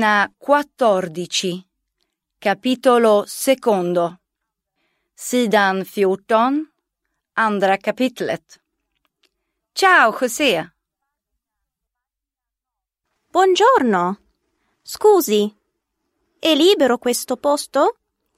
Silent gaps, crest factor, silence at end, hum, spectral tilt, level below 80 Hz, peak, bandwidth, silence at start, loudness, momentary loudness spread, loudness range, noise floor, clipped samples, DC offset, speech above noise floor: none; 18 dB; 0.45 s; none; -3.5 dB/octave; -68 dBFS; -2 dBFS; 16 kHz; 0 s; -17 LUFS; 12 LU; 3 LU; -85 dBFS; under 0.1%; under 0.1%; 69 dB